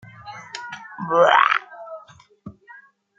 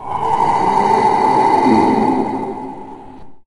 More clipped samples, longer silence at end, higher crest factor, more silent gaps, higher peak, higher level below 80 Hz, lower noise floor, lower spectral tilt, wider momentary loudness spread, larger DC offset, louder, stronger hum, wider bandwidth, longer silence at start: neither; first, 0.7 s vs 0.05 s; first, 22 dB vs 14 dB; neither; about the same, -2 dBFS vs 0 dBFS; second, -68 dBFS vs -46 dBFS; first, -48 dBFS vs -36 dBFS; second, -4 dB/octave vs -6.5 dB/octave; first, 24 LU vs 16 LU; neither; second, -17 LUFS vs -14 LUFS; neither; second, 7.6 kHz vs 11.5 kHz; first, 0.25 s vs 0 s